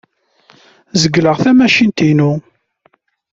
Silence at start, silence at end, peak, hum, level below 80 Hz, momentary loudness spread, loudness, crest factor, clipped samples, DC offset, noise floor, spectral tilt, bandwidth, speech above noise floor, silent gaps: 0.95 s; 0.95 s; 0 dBFS; none; -52 dBFS; 8 LU; -12 LUFS; 14 dB; under 0.1%; under 0.1%; -57 dBFS; -5.5 dB/octave; 7.8 kHz; 46 dB; none